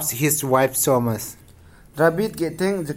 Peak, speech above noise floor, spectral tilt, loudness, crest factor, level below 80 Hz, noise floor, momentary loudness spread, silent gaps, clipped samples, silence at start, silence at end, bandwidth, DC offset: -4 dBFS; 27 dB; -4.5 dB/octave; -20 LUFS; 18 dB; -52 dBFS; -48 dBFS; 10 LU; none; under 0.1%; 0 s; 0 s; 16.5 kHz; under 0.1%